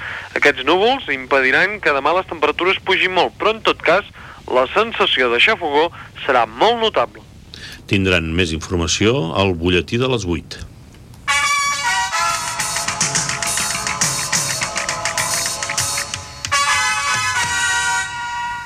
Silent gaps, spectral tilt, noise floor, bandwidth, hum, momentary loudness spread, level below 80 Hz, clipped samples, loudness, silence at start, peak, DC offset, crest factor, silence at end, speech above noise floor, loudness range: none; -2.5 dB/octave; -40 dBFS; 16 kHz; none; 8 LU; -44 dBFS; under 0.1%; -17 LUFS; 0 s; -2 dBFS; under 0.1%; 16 dB; 0 s; 23 dB; 3 LU